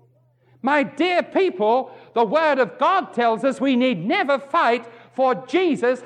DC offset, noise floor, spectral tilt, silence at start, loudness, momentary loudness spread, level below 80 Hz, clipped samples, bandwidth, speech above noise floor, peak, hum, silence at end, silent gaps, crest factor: under 0.1%; -58 dBFS; -5.5 dB/octave; 0.65 s; -20 LUFS; 4 LU; -80 dBFS; under 0.1%; 10 kHz; 38 dB; -6 dBFS; none; 0 s; none; 14 dB